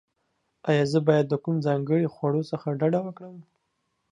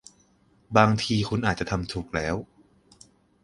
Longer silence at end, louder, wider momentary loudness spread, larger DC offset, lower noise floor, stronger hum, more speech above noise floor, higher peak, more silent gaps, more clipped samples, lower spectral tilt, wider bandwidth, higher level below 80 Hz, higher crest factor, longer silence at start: second, 0.7 s vs 1 s; about the same, -25 LUFS vs -25 LUFS; first, 13 LU vs 10 LU; neither; first, -76 dBFS vs -62 dBFS; neither; first, 51 dB vs 38 dB; second, -6 dBFS vs -2 dBFS; neither; neither; first, -8 dB/octave vs -5.5 dB/octave; second, 10 kHz vs 11.5 kHz; second, -72 dBFS vs -48 dBFS; about the same, 20 dB vs 24 dB; about the same, 0.65 s vs 0.7 s